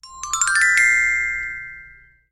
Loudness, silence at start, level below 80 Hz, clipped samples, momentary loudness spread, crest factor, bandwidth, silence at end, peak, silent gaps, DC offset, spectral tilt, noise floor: -16 LUFS; 0.05 s; -50 dBFS; under 0.1%; 16 LU; 16 dB; 15.5 kHz; 0.4 s; -4 dBFS; none; under 0.1%; 2.5 dB/octave; -47 dBFS